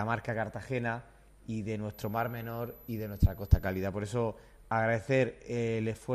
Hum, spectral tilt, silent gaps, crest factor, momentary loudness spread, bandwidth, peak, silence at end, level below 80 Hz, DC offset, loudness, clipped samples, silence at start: none; -7.5 dB/octave; none; 24 dB; 10 LU; 13 kHz; -8 dBFS; 0 s; -40 dBFS; under 0.1%; -33 LUFS; under 0.1%; 0 s